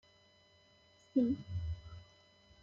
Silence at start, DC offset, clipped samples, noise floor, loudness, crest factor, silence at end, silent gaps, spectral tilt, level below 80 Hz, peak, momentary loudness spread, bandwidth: 1.15 s; under 0.1%; under 0.1%; -67 dBFS; -38 LUFS; 20 dB; 0.6 s; none; -9 dB/octave; -58 dBFS; -20 dBFS; 20 LU; 7.4 kHz